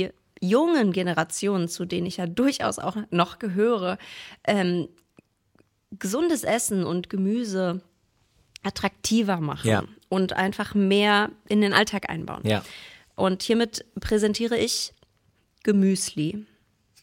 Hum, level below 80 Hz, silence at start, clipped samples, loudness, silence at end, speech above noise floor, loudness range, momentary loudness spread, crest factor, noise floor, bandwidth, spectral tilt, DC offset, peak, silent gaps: none; -54 dBFS; 0 s; under 0.1%; -25 LUFS; 0.6 s; 42 dB; 4 LU; 11 LU; 24 dB; -66 dBFS; 17 kHz; -4.5 dB/octave; under 0.1%; -2 dBFS; none